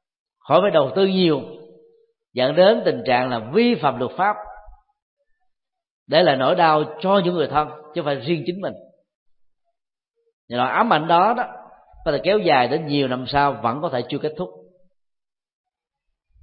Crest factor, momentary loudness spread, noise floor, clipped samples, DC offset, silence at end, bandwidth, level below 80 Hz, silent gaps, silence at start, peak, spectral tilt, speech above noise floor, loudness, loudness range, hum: 20 dB; 12 LU; -82 dBFS; under 0.1%; under 0.1%; 1.85 s; 5.2 kHz; -54 dBFS; 5.02-5.17 s, 5.91-6.06 s, 9.15-9.26 s, 10.33-10.48 s; 0.45 s; -2 dBFS; -10.5 dB/octave; 63 dB; -20 LUFS; 5 LU; none